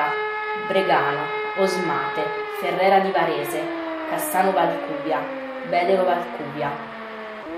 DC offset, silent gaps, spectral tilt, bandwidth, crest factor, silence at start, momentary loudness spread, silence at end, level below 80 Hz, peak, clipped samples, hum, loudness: under 0.1%; none; -4.5 dB/octave; 15.5 kHz; 16 dB; 0 s; 11 LU; 0 s; -66 dBFS; -6 dBFS; under 0.1%; none; -23 LUFS